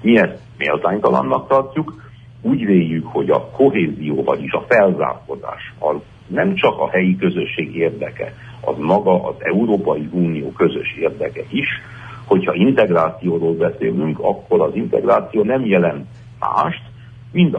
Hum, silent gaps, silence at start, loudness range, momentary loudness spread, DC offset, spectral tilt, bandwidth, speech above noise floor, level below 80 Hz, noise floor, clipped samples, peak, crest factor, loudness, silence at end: none; none; 0 s; 2 LU; 11 LU; under 0.1%; -8.5 dB/octave; 6 kHz; 21 dB; -50 dBFS; -38 dBFS; under 0.1%; -2 dBFS; 16 dB; -18 LUFS; 0 s